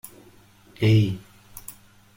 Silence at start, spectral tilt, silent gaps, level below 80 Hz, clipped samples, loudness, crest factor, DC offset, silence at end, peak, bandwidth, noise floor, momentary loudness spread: 0.8 s; -7 dB/octave; none; -54 dBFS; under 0.1%; -22 LUFS; 18 dB; under 0.1%; 0.45 s; -8 dBFS; 16.5 kHz; -53 dBFS; 24 LU